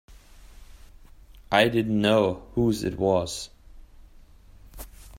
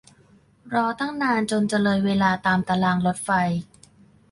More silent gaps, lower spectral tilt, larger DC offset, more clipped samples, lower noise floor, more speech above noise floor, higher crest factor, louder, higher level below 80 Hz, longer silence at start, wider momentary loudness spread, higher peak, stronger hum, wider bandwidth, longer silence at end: neither; about the same, -5.5 dB/octave vs -5.5 dB/octave; neither; neither; second, -50 dBFS vs -56 dBFS; second, 27 dB vs 34 dB; first, 22 dB vs 16 dB; about the same, -24 LUFS vs -22 LUFS; first, -48 dBFS vs -56 dBFS; second, 0.1 s vs 0.65 s; first, 22 LU vs 5 LU; first, -4 dBFS vs -8 dBFS; neither; first, 16 kHz vs 11.5 kHz; second, 0 s vs 0.7 s